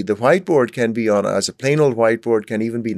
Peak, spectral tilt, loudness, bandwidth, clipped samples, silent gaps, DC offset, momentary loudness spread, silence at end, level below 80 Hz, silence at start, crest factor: -2 dBFS; -5.5 dB/octave; -17 LUFS; 13 kHz; under 0.1%; none; under 0.1%; 5 LU; 0 s; -66 dBFS; 0 s; 16 dB